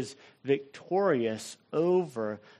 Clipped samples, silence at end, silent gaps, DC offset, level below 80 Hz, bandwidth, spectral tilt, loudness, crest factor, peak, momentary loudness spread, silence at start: under 0.1%; 0.2 s; none; under 0.1%; -76 dBFS; 13 kHz; -6 dB/octave; -30 LUFS; 16 dB; -14 dBFS; 12 LU; 0 s